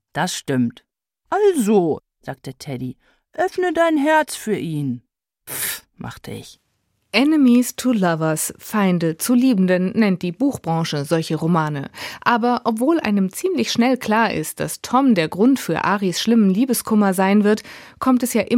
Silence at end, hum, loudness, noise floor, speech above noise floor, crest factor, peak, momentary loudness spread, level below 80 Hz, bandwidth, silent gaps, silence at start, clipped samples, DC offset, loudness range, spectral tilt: 0 s; none; -19 LUFS; -69 dBFS; 50 dB; 18 dB; -2 dBFS; 14 LU; -60 dBFS; 16.5 kHz; none; 0.15 s; under 0.1%; under 0.1%; 4 LU; -5 dB/octave